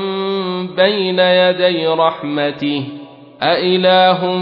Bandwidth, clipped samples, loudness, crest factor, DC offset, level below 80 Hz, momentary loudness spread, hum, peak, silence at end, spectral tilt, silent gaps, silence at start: 5.6 kHz; under 0.1%; -14 LUFS; 14 dB; under 0.1%; -62 dBFS; 9 LU; none; 0 dBFS; 0 s; -8 dB/octave; none; 0 s